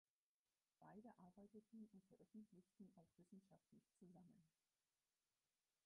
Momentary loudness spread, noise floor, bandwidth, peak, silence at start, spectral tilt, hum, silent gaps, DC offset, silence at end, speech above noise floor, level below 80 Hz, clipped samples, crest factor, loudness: 4 LU; under -90 dBFS; 1.8 kHz; -54 dBFS; 0.8 s; -4.5 dB/octave; none; none; under 0.1%; 1.35 s; over 21 dB; under -90 dBFS; under 0.1%; 16 dB; -67 LUFS